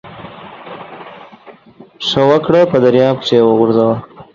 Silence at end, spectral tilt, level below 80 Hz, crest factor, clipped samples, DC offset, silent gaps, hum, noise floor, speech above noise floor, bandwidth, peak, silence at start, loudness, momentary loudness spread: 0.1 s; -6.5 dB/octave; -52 dBFS; 14 dB; under 0.1%; under 0.1%; none; none; -41 dBFS; 30 dB; 7.4 kHz; 0 dBFS; 0.05 s; -12 LUFS; 22 LU